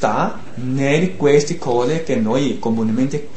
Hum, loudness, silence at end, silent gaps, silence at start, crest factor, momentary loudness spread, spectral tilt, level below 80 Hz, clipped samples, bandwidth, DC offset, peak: none; -18 LUFS; 0 s; none; 0 s; 18 dB; 6 LU; -6 dB/octave; -50 dBFS; under 0.1%; 8.8 kHz; 5%; -2 dBFS